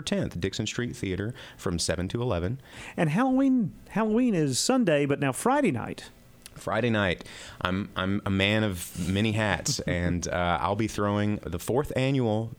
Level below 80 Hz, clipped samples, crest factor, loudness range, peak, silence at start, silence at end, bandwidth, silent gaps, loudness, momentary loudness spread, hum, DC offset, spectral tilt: -50 dBFS; under 0.1%; 20 dB; 3 LU; -6 dBFS; 0 s; 0.05 s; 18.5 kHz; none; -27 LUFS; 9 LU; none; under 0.1%; -5 dB/octave